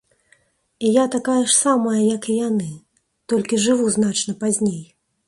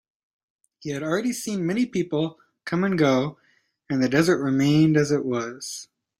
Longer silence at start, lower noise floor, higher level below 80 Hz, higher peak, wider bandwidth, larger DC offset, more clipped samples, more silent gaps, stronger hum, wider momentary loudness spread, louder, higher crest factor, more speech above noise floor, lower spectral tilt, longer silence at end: about the same, 0.8 s vs 0.85 s; about the same, -60 dBFS vs -63 dBFS; about the same, -62 dBFS vs -62 dBFS; about the same, -4 dBFS vs -6 dBFS; second, 11.5 kHz vs 16 kHz; neither; neither; neither; neither; second, 9 LU vs 14 LU; first, -19 LUFS vs -23 LUFS; about the same, 16 dB vs 18 dB; about the same, 41 dB vs 41 dB; second, -4 dB/octave vs -6 dB/octave; about the same, 0.45 s vs 0.35 s